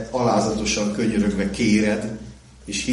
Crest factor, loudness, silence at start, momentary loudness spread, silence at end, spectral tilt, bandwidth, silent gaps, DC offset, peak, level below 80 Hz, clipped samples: 14 dB; -21 LUFS; 0 s; 15 LU; 0 s; -4.5 dB/octave; 11.5 kHz; none; under 0.1%; -8 dBFS; -42 dBFS; under 0.1%